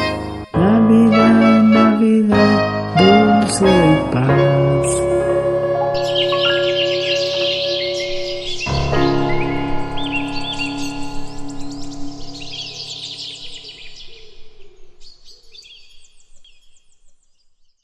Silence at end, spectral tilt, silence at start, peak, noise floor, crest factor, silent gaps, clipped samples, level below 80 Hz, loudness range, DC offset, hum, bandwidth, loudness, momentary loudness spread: 1.4 s; -5.5 dB/octave; 0 s; 0 dBFS; -53 dBFS; 16 dB; none; under 0.1%; -36 dBFS; 18 LU; under 0.1%; none; 12 kHz; -15 LUFS; 19 LU